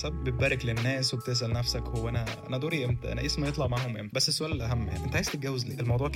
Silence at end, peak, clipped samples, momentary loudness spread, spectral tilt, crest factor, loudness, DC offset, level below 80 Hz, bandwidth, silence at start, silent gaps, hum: 0 s; -12 dBFS; under 0.1%; 5 LU; -4.5 dB/octave; 16 dB; -30 LUFS; under 0.1%; -40 dBFS; 16 kHz; 0 s; none; none